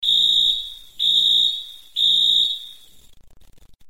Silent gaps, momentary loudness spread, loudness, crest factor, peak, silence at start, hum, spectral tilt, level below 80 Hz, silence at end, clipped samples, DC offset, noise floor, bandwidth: none; 15 LU; -16 LUFS; 16 dB; -6 dBFS; 0 s; none; 1 dB/octave; -54 dBFS; 1.15 s; under 0.1%; 0.4%; -49 dBFS; 16.5 kHz